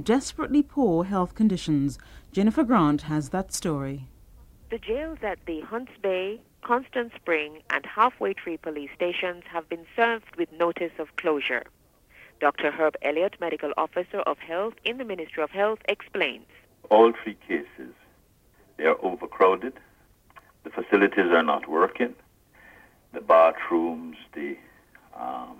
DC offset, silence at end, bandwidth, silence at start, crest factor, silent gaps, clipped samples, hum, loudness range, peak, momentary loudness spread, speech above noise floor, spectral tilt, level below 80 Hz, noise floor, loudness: under 0.1%; 0.05 s; 16 kHz; 0 s; 20 dB; none; under 0.1%; none; 5 LU; -6 dBFS; 14 LU; 35 dB; -5.5 dB/octave; -54 dBFS; -60 dBFS; -26 LUFS